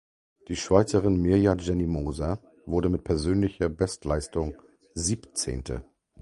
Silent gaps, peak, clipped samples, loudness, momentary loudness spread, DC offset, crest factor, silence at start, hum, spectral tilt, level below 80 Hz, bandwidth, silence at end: none; -4 dBFS; under 0.1%; -27 LUFS; 13 LU; under 0.1%; 22 dB; 0.5 s; none; -6 dB/octave; -40 dBFS; 11.5 kHz; 0.4 s